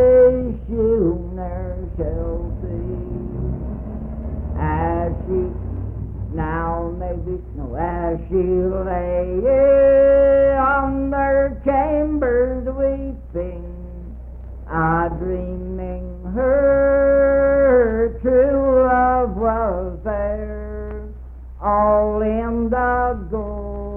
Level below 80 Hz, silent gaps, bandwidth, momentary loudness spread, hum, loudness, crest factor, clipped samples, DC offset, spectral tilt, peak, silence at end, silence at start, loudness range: -30 dBFS; none; 3.2 kHz; 15 LU; none; -19 LUFS; 14 dB; under 0.1%; under 0.1%; -11.5 dB/octave; -4 dBFS; 0 s; 0 s; 9 LU